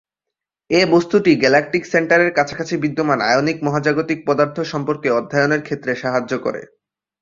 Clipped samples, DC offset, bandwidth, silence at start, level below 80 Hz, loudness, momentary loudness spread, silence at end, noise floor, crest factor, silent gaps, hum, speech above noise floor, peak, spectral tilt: under 0.1%; under 0.1%; 7.6 kHz; 0.7 s; -58 dBFS; -17 LUFS; 8 LU; 0.55 s; -84 dBFS; 16 dB; none; none; 66 dB; -2 dBFS; -5.5 dB/octave